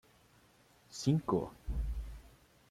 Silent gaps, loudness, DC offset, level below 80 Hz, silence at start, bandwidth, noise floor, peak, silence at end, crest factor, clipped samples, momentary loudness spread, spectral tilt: none; -37 LUFS; under 0.1%; -44 dBFS; 0.9 s; 15.5 kHz; -66 dBFS; -18 dBFS; 0.4 s; 20 dB; under 0.1%; 18 LU; -7 dB/octave